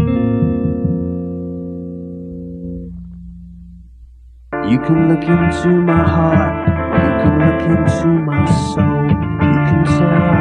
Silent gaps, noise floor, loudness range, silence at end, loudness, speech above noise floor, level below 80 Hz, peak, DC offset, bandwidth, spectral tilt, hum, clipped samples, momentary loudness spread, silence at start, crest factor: none; -39 dBFS; 13 LU; 0 s; -14 LUFS; 27 dB; -32 dBFS; 0 dBFS; under 0.1%; 9.8 kHz; -8.5 dB/octave; none; under 0.1%; 16 LU; 0 s; 14 dB